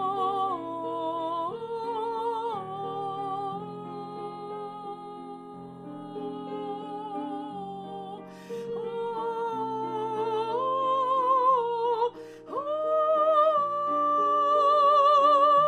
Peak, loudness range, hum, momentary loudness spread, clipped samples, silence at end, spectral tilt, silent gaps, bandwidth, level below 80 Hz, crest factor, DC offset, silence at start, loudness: -12 dBFS; 13 LU; none; 18 LU; under 0.1%; 0 s; -6 dB/octave; none; 10 kHz; -76 dBFS; 16 dB; under 0.1%; 0 s; -27 LUFS